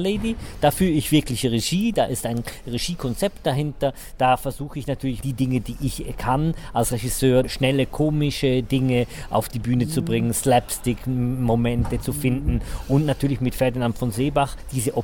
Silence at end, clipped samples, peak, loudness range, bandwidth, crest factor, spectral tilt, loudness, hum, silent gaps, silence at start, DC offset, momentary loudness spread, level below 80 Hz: 0 s; under 0.1%; -6 dBFS; 3 LU; 17.5 kHz; 16 dB; -5.5 dB/octave; -23 LUFS; none; none; 0 s; 0.5%; 7 LU; -36 dBFS